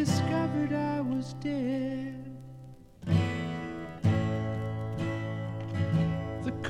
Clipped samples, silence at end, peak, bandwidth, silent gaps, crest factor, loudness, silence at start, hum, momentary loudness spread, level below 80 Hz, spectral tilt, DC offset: under 0.1%; 0 s; -14 dBFS; 13 kHz; none; 18 dB; -31 LUFS; 0 s; none; 14 LU; -54 dBFS; -7 dB/octave; under 0.1%